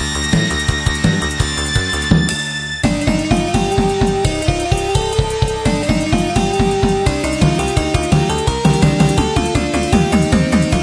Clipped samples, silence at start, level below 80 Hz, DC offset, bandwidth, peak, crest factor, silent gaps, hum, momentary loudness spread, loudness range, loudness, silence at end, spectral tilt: under 0.1%; 0 s; -24 dBFS; under 0.1%; 11 kHz; 0 dBFS; 16 dB; none; none; 4 LU; 2 LU; -16 LUFS; 0 s; -5 dB/octave